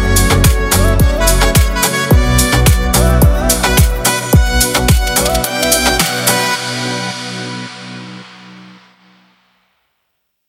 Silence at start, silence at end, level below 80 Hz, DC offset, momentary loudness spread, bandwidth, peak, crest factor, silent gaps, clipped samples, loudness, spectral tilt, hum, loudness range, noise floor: 0 s; 1.85 s; -18 dBFS; under 0.1%; 12 LU; 16.5 kHz; 0 dBFS; 12 dB; none; under 0.1%; -12 LUFS; -4 dB/octave; none; 13 LU; -68 dBFS